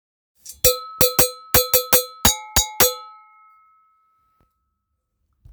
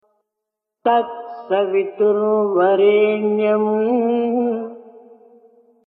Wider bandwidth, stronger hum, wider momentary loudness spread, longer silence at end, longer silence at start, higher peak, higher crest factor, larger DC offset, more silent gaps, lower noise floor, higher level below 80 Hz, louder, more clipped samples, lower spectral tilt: first, over 20 kHz vs 4 kHz; neither; second, 4 LU vs 9 LU; first, 2.45 s vs 0.9 s; second, 0.45 s vs 0.85 s; first, 0 dBFS vs -4 dBFS; first, 22 dB vs 14 dB; neither; neither; second, -75 dBFS vs -82 dBFS; first, -40 dBFS vs -72 dBFS; about the same, -16 LUFS vs -18 LUFS; neither; second, -1.5 dB/octave vs -10 dB/octave